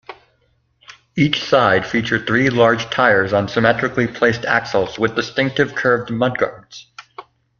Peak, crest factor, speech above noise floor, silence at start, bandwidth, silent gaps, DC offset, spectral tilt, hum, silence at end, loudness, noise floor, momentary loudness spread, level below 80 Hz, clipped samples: -2 dBFS; 18 dB; 45 dB; 0.1 s; 7.2 kHz; none; under 0.1%; -5.5 dB/octave; none; 0.35 s; -17 LUFS; -62 dBFS; 9 LU; -50 dBFS; under 0.1%